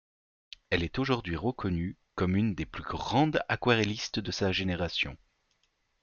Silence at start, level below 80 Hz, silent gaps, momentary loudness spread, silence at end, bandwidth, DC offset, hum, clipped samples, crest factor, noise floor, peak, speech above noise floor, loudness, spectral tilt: 0.7 s; -52 dBFS; none; 8 LU; 0.85 s; 7.2 kHz; under 0.1%; none; under 0.1%; 20 dB; -75 dBFS; -12 dBFS; 45 dB; -30 LUFS; -5.5 dB/octave